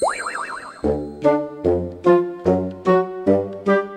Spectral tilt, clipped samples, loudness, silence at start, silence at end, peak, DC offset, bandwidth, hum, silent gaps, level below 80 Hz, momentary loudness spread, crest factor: -7 dB/octave; under 0.1%; -20 LUFS; 0 s; 0 s; -2 dBFS; under 0.1%; 9.8 kHz; none; none; -46 dBFS; 8 LU; 18 dB